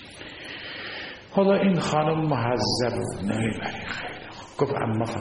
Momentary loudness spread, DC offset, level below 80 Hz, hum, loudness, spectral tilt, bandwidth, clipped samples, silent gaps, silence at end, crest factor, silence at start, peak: 14 LU; under 0.1%; -54 dBFS; none; -26 LUFS; -6 dB/octave; 11 kHz; under 0.1%; none; 0 s; 18 dB; 0 s; -8 dBFS